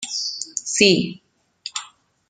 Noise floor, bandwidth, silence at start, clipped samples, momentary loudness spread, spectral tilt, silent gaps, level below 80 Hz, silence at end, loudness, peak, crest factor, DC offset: -45 dBFS; 9.6 kHz; 0 s; under 0.1%; 16 LU; -2.5 dB/octave; none; -60 dBFS; 0.45 s; -20 LUFS; -2 dBFS; 22 dB; under 0.1%